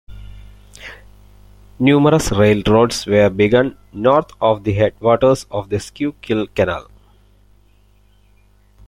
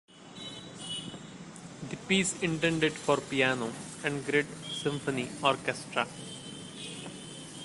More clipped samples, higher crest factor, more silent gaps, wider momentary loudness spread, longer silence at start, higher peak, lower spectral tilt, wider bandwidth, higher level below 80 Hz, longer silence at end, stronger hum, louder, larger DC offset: neither; second, 16 dB vs 22 dB; neither; second, 12 LU vs 16 LU; about the same, 0.1 s vs 0.1 s; first, -2 dBFS vs -10 dBFS; first, -6 dB/octave vs -4 dB/octave; first, 15 kHz vs 11.5 kHz; first, -40 dBFS vs -64 dBFS; first, 2.05 s vs 0 s; first, 50 Hz at -40 dBFS vs none; first, -16 LUFS vs -31 LUFS; neither